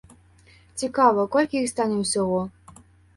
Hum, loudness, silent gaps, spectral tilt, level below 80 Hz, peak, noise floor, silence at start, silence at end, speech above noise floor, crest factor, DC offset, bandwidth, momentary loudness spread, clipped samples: none; -23 LUFS; none; -4.5 dB/octave; -58 dBFS; -6 dBFS; -54 dBFS; 0.75 s; 0.65 s; 32 dB; 18 dB; under 0.1%; 11.5 kHz; 12 LU; under 0.1%